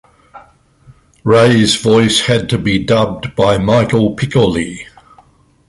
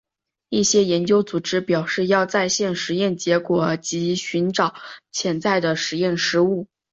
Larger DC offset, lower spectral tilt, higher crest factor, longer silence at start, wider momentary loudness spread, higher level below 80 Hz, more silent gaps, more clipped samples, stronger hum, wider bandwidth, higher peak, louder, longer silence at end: neither; about the same, -5 dB/octave vs -4 dB/octave; about the same, 14 dB vs 18 dB; second, 0.35 s vs 0.5 s; first, 9 LU vs 6 LU; first, -38 dBFS vs -62 dBFS; neither; neither; neither; first, 11.5 kHz vs 8 kHz; first, 0 dBFS vs -4 dBFS; first, -12 LUFS vs -21 LUFS; first, 0.85 s vs 0.25 s